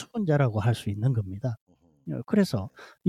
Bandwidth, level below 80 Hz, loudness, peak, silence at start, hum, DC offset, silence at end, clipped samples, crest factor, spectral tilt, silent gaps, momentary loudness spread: 14 kHz; -64 dBFS; -27 LUFS; -10 dBFS; 0 s; none; under 0.1%; 0 s; under 0.1%; 18 dB; -7.5 dB/octave; 1.61-1.67 s; 15 LU